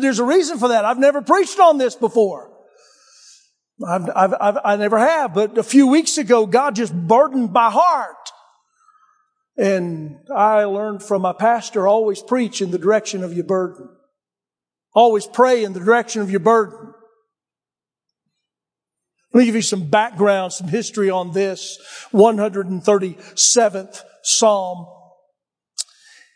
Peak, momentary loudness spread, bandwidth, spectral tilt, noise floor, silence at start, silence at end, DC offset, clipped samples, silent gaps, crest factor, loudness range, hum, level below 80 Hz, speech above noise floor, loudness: 0 dBFS; 13 LU; 10.5 kHz; -4 dB/octave; under -90 dBFS; 0 s; 0.5 s; under 0.1%; under 0.1%; none; 18 dB; 5 LU; none; -76 dBFS; over 74 dB; -17 LUFS